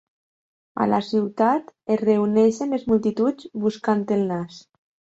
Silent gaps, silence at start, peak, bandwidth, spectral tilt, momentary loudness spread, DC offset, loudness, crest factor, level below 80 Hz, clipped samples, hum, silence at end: none; 0.75 s; -6 dBFS; 8 kHz; -7 dB/octave; 7 LU; under 0.1%; -22 LUFS; 16 dB; -62 dBFS; under 0.1%; none; 0.55 s